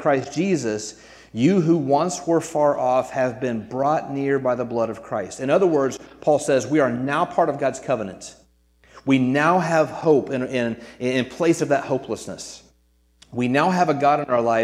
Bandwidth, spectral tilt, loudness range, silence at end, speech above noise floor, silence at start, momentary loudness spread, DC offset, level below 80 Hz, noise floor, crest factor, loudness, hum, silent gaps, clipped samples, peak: 13.5 kHz; -6 dB/octave; 2 LU; 0 s; 40 dB; 0 s; 10 LU; under 0.1%; -60 dBFS; -61 dBFS; 18 dB; -21 LUFS; none; none; under 0.1%; -2 dBFS